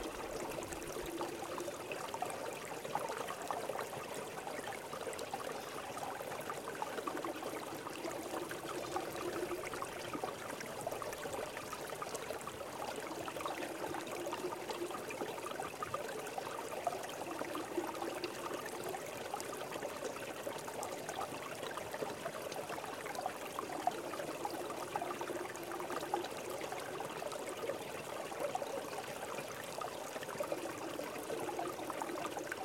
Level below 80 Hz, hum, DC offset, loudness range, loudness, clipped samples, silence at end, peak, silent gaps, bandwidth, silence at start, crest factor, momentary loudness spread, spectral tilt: -72 dBFS; none; under 0.1%; 1 LU; -42 LUFS; under 0.1%; 0 s; -20 dBFS; none; 17 kHz; 0 s; 22 dB; 3 LU; -3 dB/octave